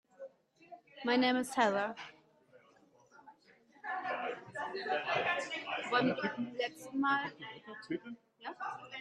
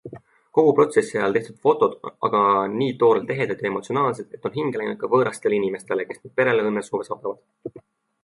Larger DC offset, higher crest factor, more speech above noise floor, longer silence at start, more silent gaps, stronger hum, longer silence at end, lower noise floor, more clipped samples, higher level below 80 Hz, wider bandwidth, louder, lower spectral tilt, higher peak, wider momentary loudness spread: neither; about the same, 22 dB vs 18 dB; first, 31 dB vs 22 dB; first, 0.2 s vs 0.05 s; neither; neither; second, 0 s vs 0.45 s; first, -66 dBFS vs -43 dBFS; neither; second, -82 dBFS vs -68 dBFS; first, 13 kHz vs 11.5 kHz; second, -35 LUFS vs -22 LUFS; second, -4 dB/octave vs -6 dB/octave; second, -14 dBFS vs -4 dBFS; first, 18 LU vs 12 LU